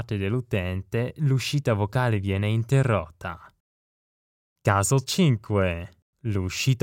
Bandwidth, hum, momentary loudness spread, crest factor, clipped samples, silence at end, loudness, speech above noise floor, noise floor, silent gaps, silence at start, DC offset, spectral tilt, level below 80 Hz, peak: 17 kHz; none; 13 LU; 20 dB; under 0.1%; 0.05 s; -25 LUFS; over 66 dB; under -90 dBFS; 3.60-4.56 s, 6.02-6.13 s; 0 s; under 0.1%; -5.5 dB/octave; -52 dBFS; -6 dBFS